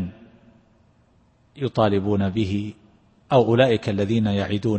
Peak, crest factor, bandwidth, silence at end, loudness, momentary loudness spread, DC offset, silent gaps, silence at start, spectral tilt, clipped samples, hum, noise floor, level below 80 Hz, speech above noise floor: -4 dBFS; 20 dB; 8.6 kHz; 0 s; -21 LUFS; 11 LU; under 0.1%; none; 0 s; -7.5 dB/octave; under 0.1%; none; -59 dBFS; -54 dBFS; 39 dB